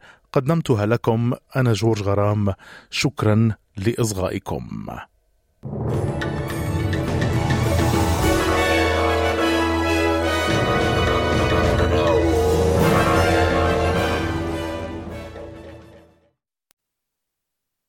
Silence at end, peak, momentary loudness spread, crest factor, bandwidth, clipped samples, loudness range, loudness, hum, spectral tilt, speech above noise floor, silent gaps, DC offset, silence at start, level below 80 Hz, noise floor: 1.9 s; -4 dBFS; 12 LU; 16 dB; 17 kHz; under 0.1%; 8 LU; -20 LUFS; none; -6 dB/octave; 60 dB; none; under 0.1%; 0.35 s; -36 dBFS; -81 dBFS